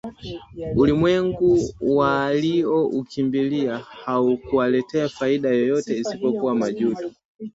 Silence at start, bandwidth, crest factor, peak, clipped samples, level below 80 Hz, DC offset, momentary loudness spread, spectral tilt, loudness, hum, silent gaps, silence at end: 0.05 s; 8 kHz; 16 dB; -6 dBFS; under 0.1%; -48 dBFS; under 0.1%; 12 LU; -7 dB/octave; -21 LUFS; none; 7.25-7.35 s; 0.05 s